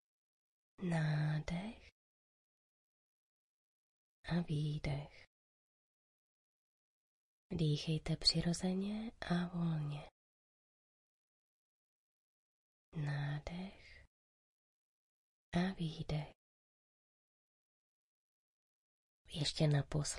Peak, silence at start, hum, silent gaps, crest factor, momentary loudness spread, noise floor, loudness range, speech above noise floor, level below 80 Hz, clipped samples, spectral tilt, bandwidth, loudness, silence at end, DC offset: -20 dBFS; 0.8 s; none; 1.92-4.24 s, 5.27-7.50 s, 10.11-12.92 s, 14.07-15.52 s, 16.35-19.25 s; 24 dB; 15 LU; under -90 dBFS; 10 LU; over 52 dB; -60 dBFS; under 0.1%; -5.5 dB/octave; 11.5 kHz; -39 LUFS; 0 s; under 0.1%